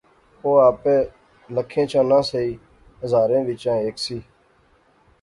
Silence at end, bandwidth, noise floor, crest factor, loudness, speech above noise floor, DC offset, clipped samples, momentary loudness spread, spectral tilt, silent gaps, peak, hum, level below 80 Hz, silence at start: 1 s; 11.5 kHz; -58 dBFS; 18 dB; -20 LUFS; 39 dB; under 0.1%; under 0.1%; 13 LU; -6 dB/octave; none; -4 dBFS; none; -54 dBFS; 0.45 s